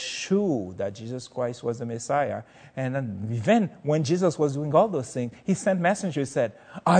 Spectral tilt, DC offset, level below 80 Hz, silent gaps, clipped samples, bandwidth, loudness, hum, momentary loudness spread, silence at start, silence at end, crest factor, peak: -6 dB/octave; under 0.1%; -68 dBFS; none; under 0.1%; 9.4 kHz; -26 LUFS; none; 10 LU; 0 s; 0 s; 20 dB; -6 dBFS